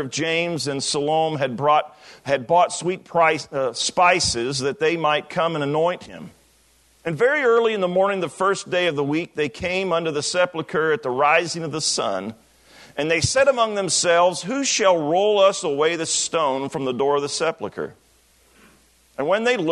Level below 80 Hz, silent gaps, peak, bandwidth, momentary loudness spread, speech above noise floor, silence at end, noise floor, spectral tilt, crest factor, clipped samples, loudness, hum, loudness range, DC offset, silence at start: -58 dBFS; none; -4 dBFS; 12 kHz; 9 LU; 37 dB; 0 s; -58 dBFS; -3 dB/octave; 18 dB; under 0.1%; -20 LUFS; none; 4 LU; under 0.1%; 0 s